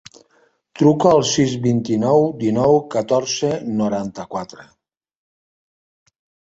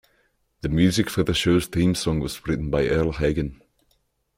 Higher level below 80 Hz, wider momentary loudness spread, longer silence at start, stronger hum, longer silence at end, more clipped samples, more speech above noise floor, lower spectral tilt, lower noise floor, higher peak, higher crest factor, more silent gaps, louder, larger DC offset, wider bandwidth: second, -54 dBFS vs -40 dBFS; first, 13 LU vs 7 LU; about the same, 0.75 s vs 0.65 s; neither; first, 1.85 s vs 0.85 s; neither; second, 42 dB vs 46 dB; about the same, -5.5 dB/octave vs -5.5 dB/octave; second, -59 dBFS vs -68 dBFS; first, -2 dBFS vs -6 dBFS; about the same, 18 dB vs 18 dB; neither; first, -18 LUFS vs -23 LUFS; neither; second, 8 kHz vs 16.5 kHz